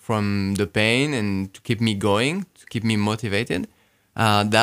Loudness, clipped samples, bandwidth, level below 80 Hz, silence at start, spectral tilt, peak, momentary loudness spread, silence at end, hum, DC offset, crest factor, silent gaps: -22 LUFS; under 0.1%; 16 kHz; -58 dBFS; 0.1 s; -5 dB/octave; 0 dBFS; 10 LU; 0 s; none; under 0.1%; 22 dB; none